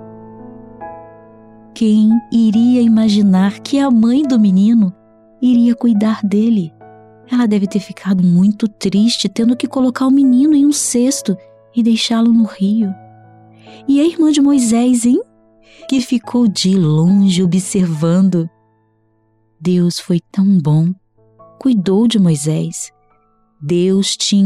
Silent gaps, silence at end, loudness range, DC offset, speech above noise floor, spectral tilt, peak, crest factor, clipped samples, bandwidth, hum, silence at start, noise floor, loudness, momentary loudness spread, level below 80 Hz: none; 0 s; 4 LU; under 0.1%; 45 dB; -6 dB/octave; -4 dBFS; 8 dB; under 0.1%; 13 kHz; none; 0 s; -58 dBFS; -13 LUFS; 9 LU; -56 dBFS